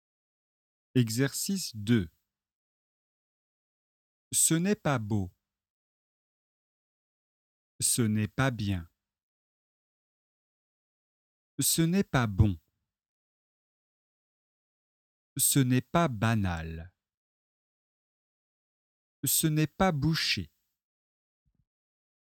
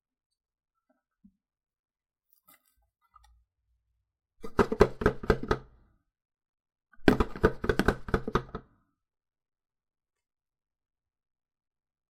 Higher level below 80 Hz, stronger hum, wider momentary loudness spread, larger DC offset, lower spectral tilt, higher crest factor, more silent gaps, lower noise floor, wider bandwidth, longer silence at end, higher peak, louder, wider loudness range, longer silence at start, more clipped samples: second, -52 dBFS vs -42 dBFS; neither; first, 13 LU vs 9 LU; neither; second, -4 dB/octave vs -7 dB/octave; second, 22 dB vs 32 dB; first, 2.55-4.31 s, 5.70-7.79 s, 9.23-11.58 s, 13.08-15.36 s, 17.14-19.23 s vs 6.25-6.29 s, 6.49-6.53 s; first, under -90 dBFS vs -77 dBFS; first, 18 kHz vs 16 kHz; second, 1.9 s vs 3.5 s; second, -10 dBFS vs -2 dBFS; about the same, -28 LUFS vs -29 LUFS; second, 5 LU vs 8 LU; second, 0.95 s vs 4.4 s; neither